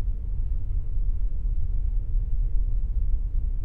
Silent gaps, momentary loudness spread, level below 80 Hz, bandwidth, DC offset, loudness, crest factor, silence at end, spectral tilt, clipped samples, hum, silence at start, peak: none; 2 LU; -24 dBFS; 0.9 kHz; under 0.1%; -31 LUFS; 12 dB; 0 s; -11 dB/octave; under 0.1%; none; 0 s; -12 dBFS